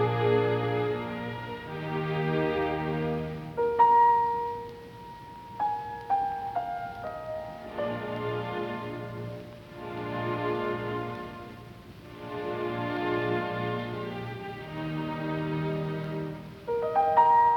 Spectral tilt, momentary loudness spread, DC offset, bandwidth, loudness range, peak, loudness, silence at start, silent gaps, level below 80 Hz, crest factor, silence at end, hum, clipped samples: -8 dB/octave; 17 LU; under 0.1%; 18.5 kHz; 8 LU; -10 dBFS; -29 LUFS; 0 s; none; -58 dBFS; 18 dB; 0 s; none; under 0.1%